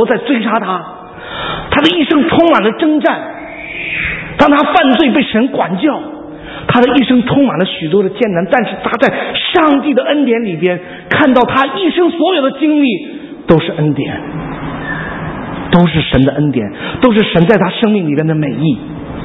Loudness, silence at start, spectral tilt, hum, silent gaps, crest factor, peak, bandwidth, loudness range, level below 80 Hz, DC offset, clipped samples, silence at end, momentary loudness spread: -12 LUFS; 0 s; -8 dB/octave; none; none; 12 dB; 0 dBFS; 7.2 kHz; 3 LU; -38 dBFS; under 0.1%; 0.2%; 0 s; 13 LU